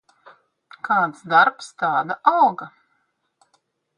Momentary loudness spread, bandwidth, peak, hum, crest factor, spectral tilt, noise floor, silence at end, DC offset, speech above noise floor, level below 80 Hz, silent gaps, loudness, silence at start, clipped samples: 18 LU; 10.5 kHz; 0 dBFS; none; 22 dB; -4.5 dB/octave; -70 dBFS; 1.3 s; under 0.1%; 51 dB; -76 dBFS; none; -19 LUFS; 0.85 s; under 0.1%